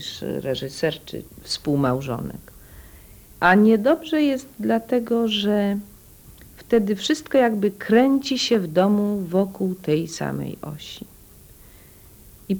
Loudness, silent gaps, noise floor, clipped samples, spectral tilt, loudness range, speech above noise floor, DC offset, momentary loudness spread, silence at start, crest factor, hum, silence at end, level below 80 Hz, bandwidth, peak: -21 LUFS; none; -48 dBFS; under 0.1%; -5.5 dB/octave; 7 LU; 26 dB; under 0.1%; 15 LU; 0 s; 18 dB; none; 0 s; -52 dBFS; over 20 kHz; -4 dBFS